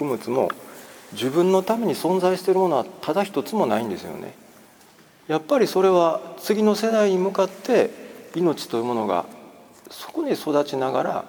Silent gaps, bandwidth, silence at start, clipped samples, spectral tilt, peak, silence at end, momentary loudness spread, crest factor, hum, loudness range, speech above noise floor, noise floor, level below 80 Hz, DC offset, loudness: none; over 20 kHz; 0 s; under 0.1%; -5.5 dB/octave; -6 dBFS; 0 s; 16 LU; 16 dB; none; 4 LU; 30 dB; -52 dBFS; -70 dBFS; under 0.1%; -22 LUFS